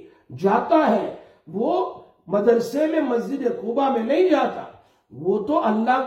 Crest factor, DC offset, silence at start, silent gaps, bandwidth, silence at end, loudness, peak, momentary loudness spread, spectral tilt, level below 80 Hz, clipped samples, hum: 16 dB; under 0.1%; 0.05 s; none; 16 kHz; 0 s; -21 LUFS; -4 dBFS; 12 LU; -7 dB/octave; -66 dBFS; under 0.1%; none